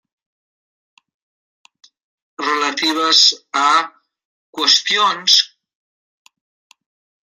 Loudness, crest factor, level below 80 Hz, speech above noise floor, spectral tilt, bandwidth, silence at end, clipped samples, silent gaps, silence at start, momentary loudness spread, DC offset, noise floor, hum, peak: -14 LUFS; 20 dB; -82 dBFS; over 75 dB; 0.5 dB/octave; 16 kHz; 1.85 s; under 0.1%; 4.25-4.53 s; 2.4 s; 14 LU; under 0.1%; under -90 dBFS; none; 0 dBFS